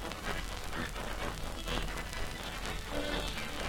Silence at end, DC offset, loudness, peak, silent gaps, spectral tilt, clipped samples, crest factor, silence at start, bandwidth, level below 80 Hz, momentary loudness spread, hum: 0 s; under 0.1%; -38 LUFS; -16 dBFS; none; -3.5 dB/octave; under 0.1%; 20 dB; 0 s; 19 kHz; -42 dBFS; 4 LU; none